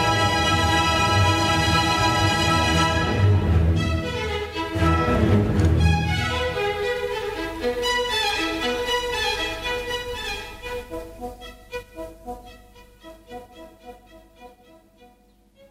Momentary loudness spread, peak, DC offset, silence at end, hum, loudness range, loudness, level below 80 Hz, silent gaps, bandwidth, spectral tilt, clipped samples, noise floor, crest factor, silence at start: 18 LU; -6 dBFS; under 0.1%; 1.2 s; 50 Hz at -45 dBFS; 19 LU; -21 LUFS; -34 dBFS; none; 15.5 kHz; -4.5 dB/octave; under 0.1%; -57 dBFS; 16 dB; 0 s